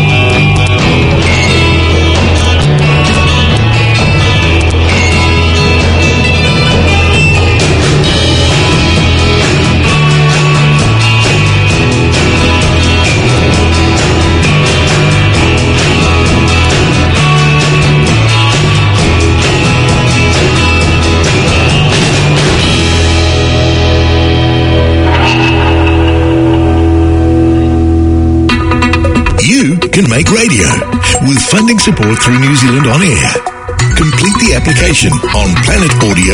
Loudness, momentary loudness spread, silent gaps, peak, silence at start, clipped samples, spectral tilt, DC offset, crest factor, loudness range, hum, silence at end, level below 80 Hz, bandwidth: -7 LUFS; 2 LU; none; 0 dBFS; 0 s; 0.6%; -5 dB/octave; under 0.1%; 8 dB; 1 LU; none; 0 s; -20 dBFS; 11 kHz